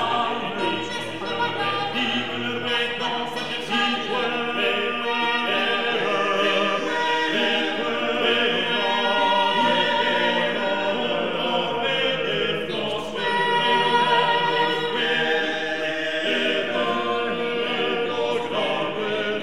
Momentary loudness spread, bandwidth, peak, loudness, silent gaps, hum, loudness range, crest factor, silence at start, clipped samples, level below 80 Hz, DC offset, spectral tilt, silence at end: 6 LU; 13.5 kHz; -6 dBFS; -22 LUFS; none; none; 3 LU; 16 dB; 0 s; under 0.1%; -60 dBFS; 0.8%; -4 dB/octave; 0 s